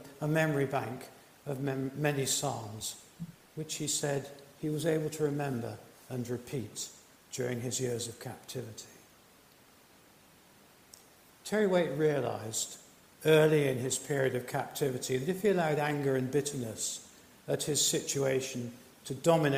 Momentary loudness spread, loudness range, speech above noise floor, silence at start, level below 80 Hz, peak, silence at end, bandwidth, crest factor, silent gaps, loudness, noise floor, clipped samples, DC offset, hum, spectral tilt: 17 LU; 10 LU; 29 dB; 0 s; -70 dBFS; -12 dBFS; 0 s; 16 kHz; 20 dB; none; -32 LUFS; -60 dBFS; under 0.1%; under 0.1%; none; -4.5 dB/octave